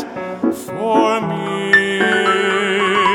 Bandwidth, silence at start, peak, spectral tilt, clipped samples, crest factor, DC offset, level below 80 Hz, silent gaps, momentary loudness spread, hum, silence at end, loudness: 17 kHz; 0 s; 0 dBFS; -4.5 dB/octave; under 0.1%; 16 dB; under 0.1%; -60 dBFS; none; 8 LU; none; 0 s; -16 LUFS